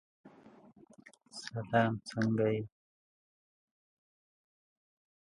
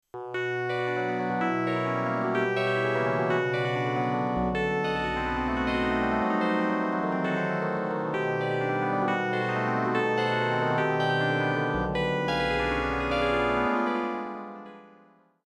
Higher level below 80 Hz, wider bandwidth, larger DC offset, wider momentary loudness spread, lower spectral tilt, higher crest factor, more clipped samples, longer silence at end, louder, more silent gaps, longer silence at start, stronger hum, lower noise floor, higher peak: second, -72 dBFS vs -46 dBFS; about the same, 11 kHz vs 11.5 kHz; neither; first, 17 LU vs 4 LU; about the same, -6.5 dB/octave vs -6.5 dB/octave; first, 24 dB vs 14 dB; neither; first, 2.55 s vs 0.55 s; second, -33 LUFS vs -27 LUFS; neither; about the same, 0.25 s vs 0.15 s; neither; about the same, -60 dBFS vs -59 dBFS; about the same, -14 dBFS vs -12 dBFS